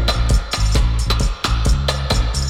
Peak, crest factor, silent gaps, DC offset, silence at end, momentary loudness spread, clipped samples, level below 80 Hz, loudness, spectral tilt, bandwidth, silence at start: -6 dBFS; 10 dB; none; under 0.1%; 0 s; 2 LU; under 0.1%; -18 dBFS; -19 LUFS; -4.5 dB/octave; 14 kHz; 0 s